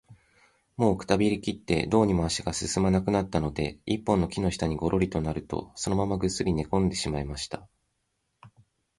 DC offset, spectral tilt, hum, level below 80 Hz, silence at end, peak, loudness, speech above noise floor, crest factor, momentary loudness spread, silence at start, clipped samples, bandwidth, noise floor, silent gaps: under 0.1%; -5.5 dB/octave; none; -44 dBFS; 0.5 s; -6 dBFS; -27 LUFS; 50 dB; 20 dB; 8 LU; 0.1 s; under 0.1%; 11.5 kHz; -77 dBFS; none